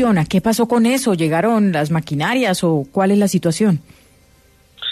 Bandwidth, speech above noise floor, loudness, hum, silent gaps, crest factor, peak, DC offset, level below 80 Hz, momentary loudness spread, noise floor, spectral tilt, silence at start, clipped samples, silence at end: 14 kHz; 36 dB; -17 LUFS; none; none; 12 dB; -4 dBFS; under 0.1%; -50 dBFS; 4 LU; -52 dBFS; -5.5 dB/octave; 0 s; under 0.1%; 0 s